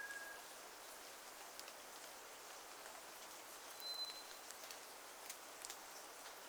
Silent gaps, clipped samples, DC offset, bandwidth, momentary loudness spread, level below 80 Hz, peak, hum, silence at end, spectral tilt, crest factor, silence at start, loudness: none; under 0.1%; under 0.1%; over 20 kHz; 7 LU; -86 dBFS; -26 dBFS; none; 0 s; 1 dB/octave; 28 dB; 0 s; -52 LUFS